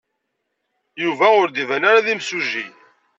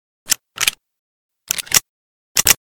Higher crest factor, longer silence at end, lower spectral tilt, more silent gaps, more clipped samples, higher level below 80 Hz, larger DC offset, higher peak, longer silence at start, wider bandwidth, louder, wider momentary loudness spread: about the same, 18 dB vs 22 dB; first, 0.5 s vs 0.1 s; first, -3.5 dB/octave vs 1 dB/octave; second, none vs 0.99-1.29 s, 1.89-2.35 s; second, under 0.1% vs 0.2%; second, -76 dBFS vs -48 dBFS; neither; about the same, -2 dBFS vs 0 dBFS; first, 0.95 s vs 0.25 s; second, 8 kHz vs over 20 kHz; about the same, -17 LUFS vs -17 LUFS; first, 10 LU vs 7 LU